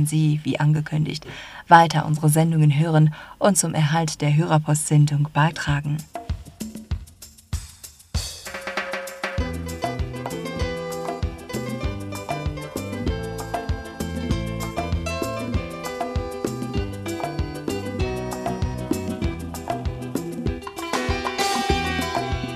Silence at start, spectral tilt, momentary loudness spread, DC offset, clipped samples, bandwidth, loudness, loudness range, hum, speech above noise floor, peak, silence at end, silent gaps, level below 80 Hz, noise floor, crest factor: 0 s; -5.5 dB/octave; 13 LU; under 0.1%; under 0.1%; 14 kHz; -24 LUFS; 11 LU; none; 26 dB; 0 dBFS; 0 s; none; -38 dBFS; -45 dBFS; 24 dB